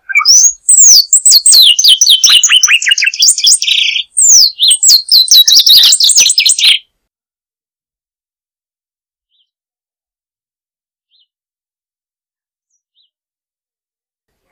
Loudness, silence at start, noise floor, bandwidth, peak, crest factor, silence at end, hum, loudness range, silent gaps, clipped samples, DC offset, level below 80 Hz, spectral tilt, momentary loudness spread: -3 LUFS; 0.1 s; under -90 dBFS; over 20 kHz; 0 dBFS; 10 dB; 7.75 s; none; 7 LU; none; 2%; under 0.1%; -60 dBFS; 6.5 dB/octave; 6 LU